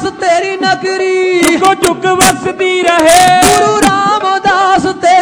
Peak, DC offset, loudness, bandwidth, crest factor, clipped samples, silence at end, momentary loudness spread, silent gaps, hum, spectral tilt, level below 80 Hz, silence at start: 0 dBFS; under 0.1%; -9 LUFS; 11 kHz; 8 dB; 0.6%; 0 s; 7 LU; none; none; -3 dB/octave; -38 dBFS; 0 s